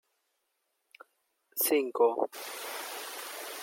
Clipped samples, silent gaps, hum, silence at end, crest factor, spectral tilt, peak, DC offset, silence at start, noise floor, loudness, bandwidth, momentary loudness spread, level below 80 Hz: under 0.1%; none; none; 0 s; 20 dB; -1 dB/octave; -14 dBFS; under 0.1%; 1.55 s; -80 dBFS; -31 LUFS; 17 kHz; 12 LU; under -90 dBFS